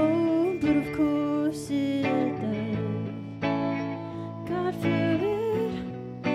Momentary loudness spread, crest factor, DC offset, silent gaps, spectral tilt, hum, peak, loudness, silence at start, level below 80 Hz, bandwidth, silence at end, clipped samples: 9 LU; 14 dB; under 0.1%; none; -7.5 dB/octave; none; -12 dBFS; -28 LUFS; 0 s; -56 dBFS; 14 kHz; 0 s; under 0.1%